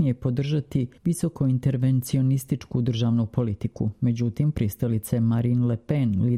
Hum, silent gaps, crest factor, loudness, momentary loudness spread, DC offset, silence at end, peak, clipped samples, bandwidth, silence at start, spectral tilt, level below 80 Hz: none; none; 12 dB; -25 LUFS; 4 LU; under 0.1%; 0 s; -10 dBFS; under 0.1%; 15.5 kHz; 0 s; -8 dB/octave; -50 dBFS